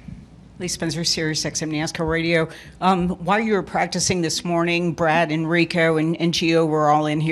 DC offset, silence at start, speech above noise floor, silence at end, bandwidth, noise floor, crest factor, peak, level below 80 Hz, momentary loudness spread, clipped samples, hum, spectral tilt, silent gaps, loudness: under 0.1%; 0.05 s; 21 dB; 0 s; 13 kHz; -41 dBFS; 18 dB; -4 dBFS; -48 dBFS; 6 LU; under 0.1%; none; -4.5 dB/octave; none; -20 LUFS